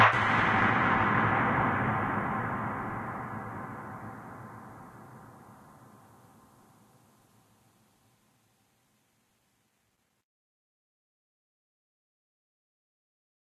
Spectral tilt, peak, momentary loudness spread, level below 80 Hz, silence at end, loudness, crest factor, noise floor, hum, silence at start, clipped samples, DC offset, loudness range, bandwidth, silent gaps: -6.5 dB/octave; -10 dBFS; 24 LU; -58 dBFS; 7.95 s; -28 LUFS; 24 dB; -75 dBFS; none; 0 s; under 0.1%; under 0.1%; 24 LU; 14 kHz; none